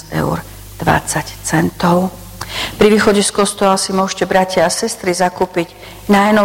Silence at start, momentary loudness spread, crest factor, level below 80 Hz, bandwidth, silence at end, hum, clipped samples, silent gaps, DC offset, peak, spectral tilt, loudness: 0.05 s; 11 LU; 14 dB; -38 dBFS; 17 kHz; 0 s; none; under 0.1%; none; under 0.1%; -2 dBFS; -4.5 dB/octave; -15 LUFS